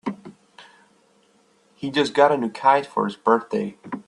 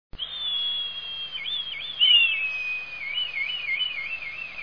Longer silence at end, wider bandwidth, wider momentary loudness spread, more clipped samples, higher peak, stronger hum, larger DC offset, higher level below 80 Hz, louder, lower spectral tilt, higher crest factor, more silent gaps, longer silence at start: about the same, 0.05 s vs 0 s; first, 11 kHz vs 5.4 kHz; about the same, 15 LU vs 14 LU; neither; first, -2 dBFS vs -10 dBFS; neither; second, under 0.1% vs 0.4%; second, -68 dBFS vs -56 dBFS; first, -21 LUFS vs -24 LUFS; first, -5.5 dB/octave vs -0.5 dB/octave; about the same, 22 dB vs 18 dB; neither; about the same, 0.05 s vs 0.1 s